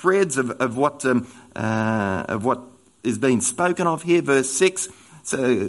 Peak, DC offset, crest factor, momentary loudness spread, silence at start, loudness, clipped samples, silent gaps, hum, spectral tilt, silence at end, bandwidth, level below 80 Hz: -4 dBFS; under 0.1%; 18 dB; 10 LU; 0 s; -22 LUFS; under 0.1%; none; none; -4.5 dB/octave; 0 s; 11.5 kHz; -62 dBFS